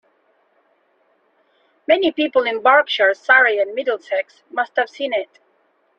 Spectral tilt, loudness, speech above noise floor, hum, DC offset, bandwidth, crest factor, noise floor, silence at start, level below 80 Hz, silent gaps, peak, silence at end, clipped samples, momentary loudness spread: -3 dB/octave; -17 LUFS; 45 dB; none; under 0.1%; 7.4 kHz; 18 dB; -62 dBFS; 1.9 s; -68 dBFS; none; -2 dBFS; 0.75 s; under 0.1%; 12 LU